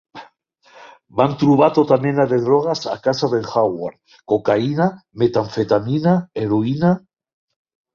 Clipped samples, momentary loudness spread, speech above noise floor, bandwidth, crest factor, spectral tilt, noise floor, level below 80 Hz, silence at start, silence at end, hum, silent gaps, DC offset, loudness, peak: under 0.1%; 7 LU; 36 dB; 7.2 kHz; 16 dB; -7.5 dB/octave; -54 dBFS; -56 dBFS; 0.15 s; 0.95 s; none; none; under 0.1%; -18 LUFS; -2 dBFS